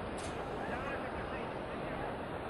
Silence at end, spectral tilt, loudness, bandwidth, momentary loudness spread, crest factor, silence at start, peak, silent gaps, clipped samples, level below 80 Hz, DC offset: 0 s; -5.5 dB/octave; -40 LUFS; 12.5 kHz; 2 LU; 12 dB; 0 s; -28 dBFS; none; under 0.1%; -54 dBFS; under 0.1%